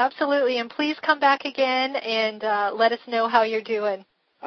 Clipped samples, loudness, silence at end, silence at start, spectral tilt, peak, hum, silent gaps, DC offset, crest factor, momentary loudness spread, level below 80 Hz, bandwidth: under 0.1%; -23 LUFS; 0 s; 0 s; -4 dB/octave; -4 dBFS; none; none; under 0.1%; 18 dB; 6 LU; -76 dBFS; 6.4 kHz